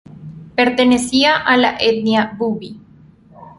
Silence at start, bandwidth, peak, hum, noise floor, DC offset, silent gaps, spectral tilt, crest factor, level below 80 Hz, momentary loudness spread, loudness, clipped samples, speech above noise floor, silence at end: 0.1 s; 11.5 kHz; -2 dBFS; none; -45 dBFS; under 0.1%; none; -4 dB/octave; 16 dB; -50 dBFS; 17 LU; -15 LUFS; under 0.1%; 31 dB; 0.1 s